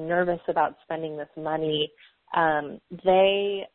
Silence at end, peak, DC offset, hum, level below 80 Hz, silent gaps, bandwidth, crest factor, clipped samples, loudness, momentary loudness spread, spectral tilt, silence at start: 0.1 s; -8 dBFS; under 0.1%; none; -60 dBFS; none; 4.2 kHz; 16 dB; under 0.1%; -25 LUFS; 13 LU; -9.5 dB/octave; 0 s